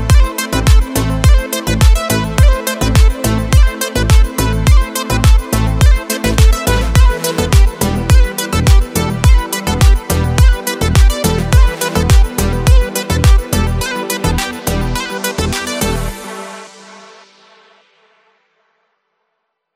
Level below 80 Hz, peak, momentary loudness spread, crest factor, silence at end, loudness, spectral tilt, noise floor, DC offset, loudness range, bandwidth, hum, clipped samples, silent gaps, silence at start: -14 dBFS; 0 dBFS; 6 LU; 12 dB; 3.1 s; -13 LUFS; -5 dB/octave; -70 dBFS; under 0.1%; 8 LU; 16 kHz; none; under 0.1%; none; 0 s